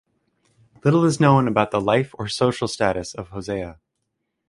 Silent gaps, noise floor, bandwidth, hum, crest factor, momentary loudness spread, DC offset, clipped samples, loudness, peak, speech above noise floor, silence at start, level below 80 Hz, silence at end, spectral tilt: none; -77 dBFS; 11.5 kHz; none; 20 dB; 13 LU; under 0.1%; under 0.1%; -21 LUFS; -2 dBFS; 57 dB; 0.85 s; -50 dBFS; 0.75 s; -6 dB/octave